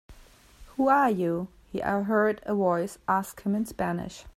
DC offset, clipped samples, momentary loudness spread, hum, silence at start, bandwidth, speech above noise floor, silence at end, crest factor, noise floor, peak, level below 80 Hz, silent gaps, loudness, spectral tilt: under 0.1%; under 0.1%; 11 LU; none; 0.1 s; 16 kHz; 27 dB; 0.05 s; 18 dB; -53 dBFS; -10 dBFS; -56 dBFS; none; -27 LUFS; -6.5 dB/octave